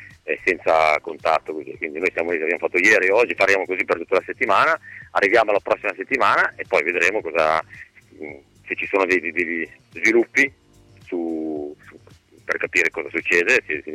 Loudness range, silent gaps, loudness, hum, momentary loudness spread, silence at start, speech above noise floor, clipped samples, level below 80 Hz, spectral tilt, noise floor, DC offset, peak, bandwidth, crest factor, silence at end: 4 LU; none; -19 LUFS; none; 13 LU; 0 s; 30 dB; under 0.1%; -60 dBFS; -3.5 dB/octave; -51 dBFS; under 0.1%; -6 dBFS; 15 kHz; 16 dB; 0 s